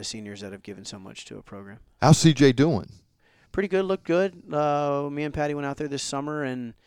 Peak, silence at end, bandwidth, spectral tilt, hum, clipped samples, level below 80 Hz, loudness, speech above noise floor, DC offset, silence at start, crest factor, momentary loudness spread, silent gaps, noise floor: -4 dBFS; 0.15 s; 15 kHz; -5.5 dB/octave; none; under 0.1%; -54 dBFS; -24 LUFS; 37 dB; under 0.1%; 0 s; 22 dB; 22 LU; none; -62 dBFS